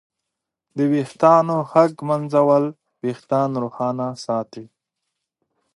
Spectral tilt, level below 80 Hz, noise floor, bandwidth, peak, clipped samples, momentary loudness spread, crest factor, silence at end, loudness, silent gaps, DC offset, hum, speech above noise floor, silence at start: -7.5 dB/octave; -72 dBFS; -82 dBFS; 11.5 kHz; 0 dBFS; under 0.1%; 13 LU; 20 dB; 1.1 s; -20 LUFS; none; under 0.1%; none; 63 dB; 0.75 s